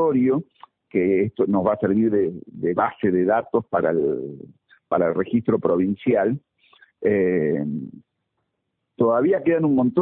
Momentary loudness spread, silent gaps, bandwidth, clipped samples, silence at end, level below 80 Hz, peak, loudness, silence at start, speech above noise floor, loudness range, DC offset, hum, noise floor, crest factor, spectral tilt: 8 LU; none; 3.9 kHz; under 0.1%; 0 s; -60 dBFS; -4 dBFS; -21 LUFS; 0 s; 57 dB; 3 LU; under 0.1%; none; -77 dBFS; 16 dB; -13 dB/octave